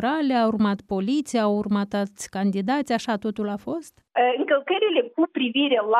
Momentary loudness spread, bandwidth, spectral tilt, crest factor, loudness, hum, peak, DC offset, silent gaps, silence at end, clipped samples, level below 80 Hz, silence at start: 8 LU; 13 kHz; -5.5 dB/octave; 16 dB; -24 LUFS; none; -8 dBFS; under 0.1%; none; 0 s; under 0.1%; -62 dBFS; 0 s